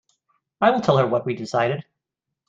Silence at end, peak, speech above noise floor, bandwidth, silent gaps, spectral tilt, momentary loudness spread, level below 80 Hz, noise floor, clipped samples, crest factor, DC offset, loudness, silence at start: 0.65 s; -2 dBFS; 63 dB; 8 kHz; none; -6.5 dB/octave; 7 LU; -62 dBFS; -83 dBFS; under 0.1%; 20 dB; under 0.1%; -21 LUFS; 0.6 s